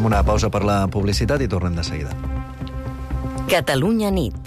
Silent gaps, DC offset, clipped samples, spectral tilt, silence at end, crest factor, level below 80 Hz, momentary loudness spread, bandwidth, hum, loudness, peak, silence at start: none; under 0.1%; under 0.1%; -6 dB/octave; 0 s; 12 dB; -28 dBFS; 11 LU; 15 kHz; none; -21 LUFS; -8 dBFS; 0 s